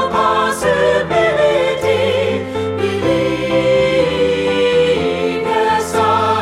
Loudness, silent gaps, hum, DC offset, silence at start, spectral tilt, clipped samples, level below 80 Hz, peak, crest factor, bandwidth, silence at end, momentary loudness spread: -15 LUFS; none; none; under 0.1%; 0 s; -5 dB/octave; under 0.1%; -42 dBFS; -2 dBFS; 12 dB; 14.5 kHz; 0 s; 4 LU